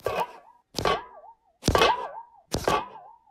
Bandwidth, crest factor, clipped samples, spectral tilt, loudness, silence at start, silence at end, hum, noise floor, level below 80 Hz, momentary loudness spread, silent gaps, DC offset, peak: 16 kHz; 22 dB; under 0.1%; -4 dB/octave; -27 LUFS; 0.05 s; 0.2 s; none; -51 dBFS; -44 dBFS; 19 LU; none; under 0.1%; -6 dBFS